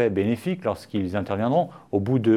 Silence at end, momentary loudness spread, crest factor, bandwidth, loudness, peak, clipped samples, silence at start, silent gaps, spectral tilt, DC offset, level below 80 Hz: 0 s; 5 LU; 14 dB; 14.5 kHz; -25 LUFS; -8 dBFS; under 0.1%; 0 s; none; -8 dB/octave; under 0.1%; -60 dBFS